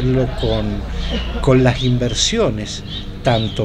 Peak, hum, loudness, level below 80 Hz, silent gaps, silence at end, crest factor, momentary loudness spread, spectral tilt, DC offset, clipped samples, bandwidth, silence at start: -2 dBFS; none; -18 LUFS; -26 dBFS; none; 0 s; 16 dB; 11 LU; -5 dB/octave; under 0.1%; under 0.1%; 10 kHz; 0 s